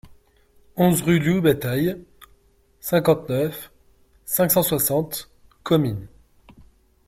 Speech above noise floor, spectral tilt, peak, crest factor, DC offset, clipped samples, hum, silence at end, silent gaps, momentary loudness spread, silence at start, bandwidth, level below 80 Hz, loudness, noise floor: 38 dB; -5.5 dB/octave; -4 dBFS; 18 dB; under 0.1%; under 0.1%; none; 1 s; none; 17 LU; 0.05 s; 16.5 kHz; -52 dBFS; -21 LUFS; -58 dBFS